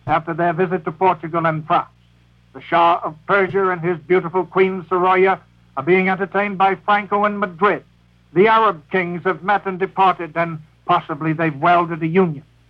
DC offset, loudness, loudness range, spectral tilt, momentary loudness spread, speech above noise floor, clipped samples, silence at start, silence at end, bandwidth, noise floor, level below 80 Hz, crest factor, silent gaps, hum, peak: under 0.1%; -18 LUFS; 2 LU; -8.5 dB/octave; 7 LU; 35 dB; under 0.1%; 0.05 s; 0.3 s; 5.4 kHz; -53 dBFS; -56 dBFS; 16 dB; none; none; -2 dBFS